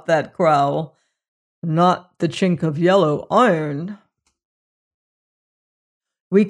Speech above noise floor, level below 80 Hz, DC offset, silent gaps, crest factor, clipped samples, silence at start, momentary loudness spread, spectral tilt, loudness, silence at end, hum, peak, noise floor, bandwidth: over 72 dB; -64 dBFS; under 0.1%; 1.28-1.62 s, 4.45-6.00 s, 6.20-6.31 s; 16 dB; under 0.1%; 0.1 s; 12 LU; -7 dB/octave; -18 LUFS; 0 s; none; -4 dBFS; under -90 dBFS; 10.5 kHz